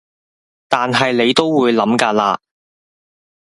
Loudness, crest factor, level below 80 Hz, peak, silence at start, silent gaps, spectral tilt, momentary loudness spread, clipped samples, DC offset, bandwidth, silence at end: -15 LUFS; 18 dB; -60 dBFS; 0 dBFS; 0.7 s; none; -4.5 dB/octave; 6 LU; under 0.1%; under 0.1%; 11.5 kHz; 1.05 s